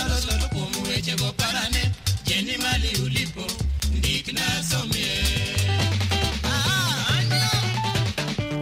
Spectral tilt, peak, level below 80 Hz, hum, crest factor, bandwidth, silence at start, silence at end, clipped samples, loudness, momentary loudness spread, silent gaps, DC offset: -3.5 dB/octave; -10 dBFS; -32 dBFS; none; 14 dB; 16 kHz; 0 s; 0 s; under 0.1%; -23 LUFS; 5 LU; none; under 0.1%